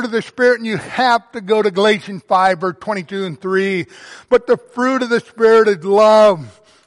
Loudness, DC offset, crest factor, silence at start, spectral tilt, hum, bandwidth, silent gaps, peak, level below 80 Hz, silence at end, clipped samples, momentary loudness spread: -15 LUFS; under 0.1%; 12 dB; 0 s; -5 dB/octave; none; 11.5 kHz; none; -2 dBFS; -60 dBFS; 0.35 s; under 0.1%; 11 LU